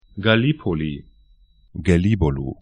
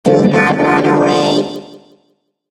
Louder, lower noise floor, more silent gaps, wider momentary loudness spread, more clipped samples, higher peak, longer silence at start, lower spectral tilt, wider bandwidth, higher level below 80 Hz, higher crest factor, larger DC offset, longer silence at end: second, -20 LUFS vs -12 LUFS; second, -54 dBFS vs -61 dBFS; neither; first, 13 LU vs 10 LU; neither; about the same, 0 dBFS vs 0 dBFS; about the same, 0.15 s vs 0.05 s; first, -7.5 dB/octave vs -6 dB/octave; second, 9.8 kHz vs 12.5 kHz; first, -36 dBFS vs -52 dBFS; first, 20 dB vs 14 dB; neither; second, 0.1 s vs 0.75 s